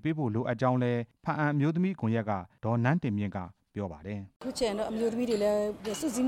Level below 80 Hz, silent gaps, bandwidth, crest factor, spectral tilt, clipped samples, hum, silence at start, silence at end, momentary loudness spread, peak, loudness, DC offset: -60 dBFS; 4.36-4.40 s; 16 kHz; 16 dB; -6.5 dB/octave; under 0.1%; none; 0.05 s; 0 s; 11 LU; -14 dBFS; -31 LUFS; under 0.1%